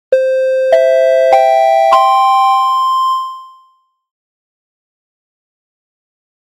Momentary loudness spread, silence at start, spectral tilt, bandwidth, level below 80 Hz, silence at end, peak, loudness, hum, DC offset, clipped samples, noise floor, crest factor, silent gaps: 5 LU; 0.1 s; -0.5 dB/octave; 16 kHz; -64 dBFS; 2.95 s; 0 dBFS; -10 LUFS; none; under 0.1%; under 0.1%; -53 dBFS; 12 dB; none